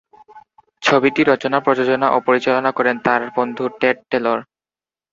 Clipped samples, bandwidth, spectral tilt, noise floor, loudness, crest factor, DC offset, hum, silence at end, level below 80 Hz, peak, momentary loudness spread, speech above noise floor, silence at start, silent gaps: under 0.1%; 7.8 kHz; -5.5 dB/octave; under -90 dBFS; -17 LUFS; 16 dB; under 0.1%; none; 0.7 s; -62 dBFS; -2 dBFS; 6 LU; over 73 dB; 0.35 s; none